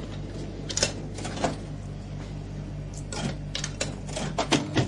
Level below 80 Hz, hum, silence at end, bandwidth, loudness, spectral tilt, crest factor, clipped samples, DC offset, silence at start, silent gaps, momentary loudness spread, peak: -42 dBFS; 50 Hz at -40 dBFS; 0 s; 11.5 kHz; -31 LUFS; -4 dB/octave; 24 dB; under 0.1%; under 0.1%; 0 s; none; 11 LU; -8 dBFS